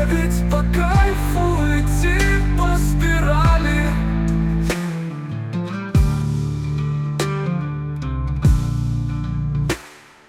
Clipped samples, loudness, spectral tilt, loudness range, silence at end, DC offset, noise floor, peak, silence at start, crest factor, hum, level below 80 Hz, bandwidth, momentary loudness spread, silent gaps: under 0.1%; -20 LUFS; -6.5 dB/octave; 4 LU; 0.35 s; under 0.1%; -43 dBFS; -4 dBFS; 0 s; 14 dB; none; -22 dBFS; 16 kHz; 9 LU; none